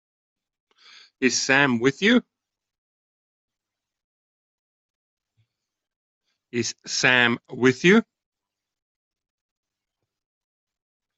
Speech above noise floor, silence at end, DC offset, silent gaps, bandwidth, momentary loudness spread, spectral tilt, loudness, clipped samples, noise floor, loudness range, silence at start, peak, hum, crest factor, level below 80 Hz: 67 dB; 3.15 s; under 0.1%; 2.78-3.48 s, 4.04-5.17 s, 5.96-6.21 s; 8.2 kHz; 11 LU; -3.5 dB/octave; -20 LUFS; under 0.1%; -87 dBFS; 7 LU; 1.2 s; -4 dBFS; none; 22 dB; -68 dBFS